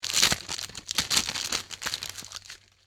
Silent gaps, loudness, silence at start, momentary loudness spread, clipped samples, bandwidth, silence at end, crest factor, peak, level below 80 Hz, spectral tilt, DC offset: none; -27 LUFS; 0 s; 18 LU; under 0.1%; over 20 kHz; 0.3 s; 26 dB; -4 dBFS; -54 dBFS; 0 dB/octave; under 0.1%